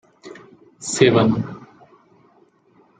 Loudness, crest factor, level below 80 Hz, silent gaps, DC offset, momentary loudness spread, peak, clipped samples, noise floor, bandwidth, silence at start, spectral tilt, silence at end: -18 LUFS; 20 dB; -56 dBFS; none; under 0.1%; 27 LU; -2 dBFS; under 0.1%; -57 dBFS; 9.6 kHz; 0.25 s; -5 dB/octave; 1.4 s